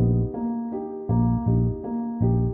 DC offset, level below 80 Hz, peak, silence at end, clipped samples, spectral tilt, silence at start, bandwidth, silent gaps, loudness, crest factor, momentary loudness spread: under 0.1%; -36 dBFS; -10 dBFS; 0 s; under 0.1%; -15.5 dB/octave; 0 s; 1.8 kHz; none; -25 LUFS; 12 dB; 7 LU